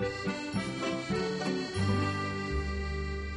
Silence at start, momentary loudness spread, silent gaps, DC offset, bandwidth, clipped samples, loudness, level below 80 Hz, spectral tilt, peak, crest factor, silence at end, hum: 0 s; 5 LU; none; under 0.1%; 11.5 kHz; under 0.1%; -33 LUFS; -42 dBFS; -6 dB/octave; -18 dBFS; 16 dB; 0 s; none